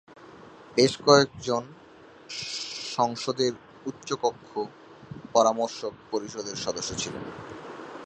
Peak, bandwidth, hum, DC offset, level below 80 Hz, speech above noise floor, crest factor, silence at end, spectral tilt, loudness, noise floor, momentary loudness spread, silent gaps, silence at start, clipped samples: -2 dBFS; 10.5 kHz; none; under 0.1%; -62 dBFS; 24 dB; 26 dB; 0 s; -3.5 dB/octave; -27 LUFS; -51 dBFS; 19 LU; none; 0.1 s; under 0.1%